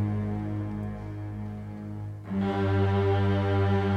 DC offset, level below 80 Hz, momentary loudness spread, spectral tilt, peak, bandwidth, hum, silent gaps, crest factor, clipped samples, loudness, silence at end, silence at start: under 0.1%; -50 dBFS; 13 LU; -9 dB/octave; -14 dBFS; 5.4 kHz; none; none; 14 dB; under 0.1%; -29 LUFS; 0 s; 0 s